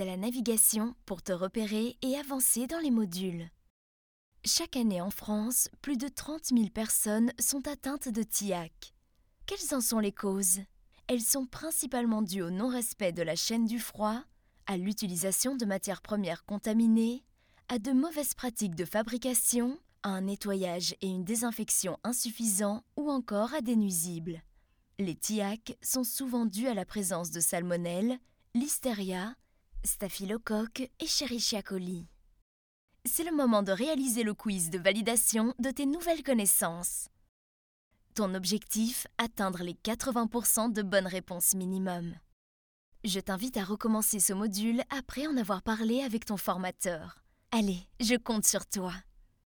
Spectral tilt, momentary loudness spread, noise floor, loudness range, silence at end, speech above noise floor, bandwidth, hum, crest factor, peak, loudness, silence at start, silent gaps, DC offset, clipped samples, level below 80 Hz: -3.5 dB/octave; 10 LU; -67 dBFS; 4 LU; 0.45 s; 36 dB; over 20 kHz; none; 22 dB; -10 dBFS; -31 LUFS; 0 s; 3.70-4.32 s, 32.42-32.88 s, 37.29-37.91 s, 42.33-42.92 s; under 0.1%; under 0.1%; -58 dBFS